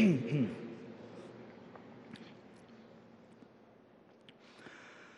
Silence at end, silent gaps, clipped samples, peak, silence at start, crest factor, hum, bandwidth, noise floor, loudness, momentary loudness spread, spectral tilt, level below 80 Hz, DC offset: 0.15 s; none; under 0.1%; -18 dBFS; 0 s; 22 dB; none; 9.8 kHz; -62 dBFS; -39 LUFS; 25 LU; -8 dB/octave; -82 dBFS; under 0.1%